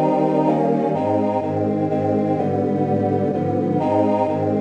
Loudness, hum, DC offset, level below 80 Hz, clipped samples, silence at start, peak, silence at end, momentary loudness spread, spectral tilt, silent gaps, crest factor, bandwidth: -20 LUFS; none; under 0.1%; -62 dBFS; under 0.1%; 0 s; -6 dBFS; 0 s; 3 LU; -9.5 dB/octave; none; 12 dB; 8.2 kHz